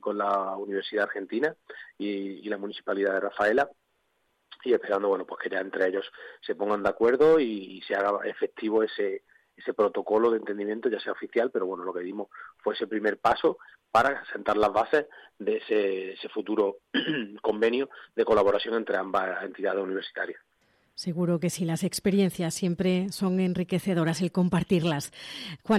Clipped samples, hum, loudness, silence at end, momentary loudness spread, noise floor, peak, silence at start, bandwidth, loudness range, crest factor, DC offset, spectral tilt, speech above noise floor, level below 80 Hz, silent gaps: under 0.1%; none; -28 LUFS; 0 s; 11 LU; -73 dBFS; -10 dBFS; 0.05 s; 14.5 kHz; 3 LU; 18 dB; under 0.1%; -5.5 dB/octave; 46 dB; -64 dBFS; none